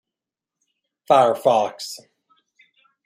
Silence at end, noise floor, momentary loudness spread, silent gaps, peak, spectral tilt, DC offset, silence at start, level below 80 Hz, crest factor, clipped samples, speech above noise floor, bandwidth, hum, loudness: 1.1 s; -87 dBFS; 17 LU; none; -2 dBFS; -4 dB/octave; under 0.1%; 1.1 s; -76 dBFS; 22 dB; under 0.1%; 69 dB; 15.5 kHz; none; -18 LUFS